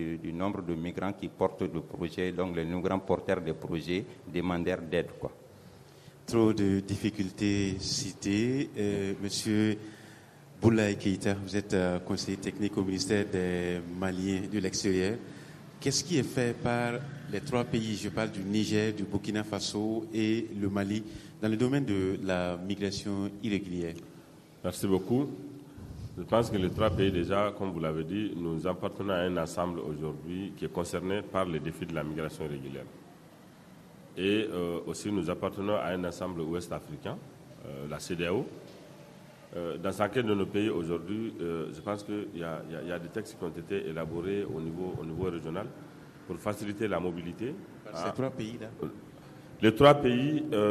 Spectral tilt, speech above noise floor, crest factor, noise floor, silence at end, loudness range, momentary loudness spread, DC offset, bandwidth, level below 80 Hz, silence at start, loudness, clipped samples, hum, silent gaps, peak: -5.5 dB/octave; 23 dB; 24 dB; -54 dBFS; 0 s; 6 LU; 13 LU; under 0.1%; 13.5 kHz; -60 dBFS; 0 s; -32 LUFS; under 0.1%; none; none; -8 dBFS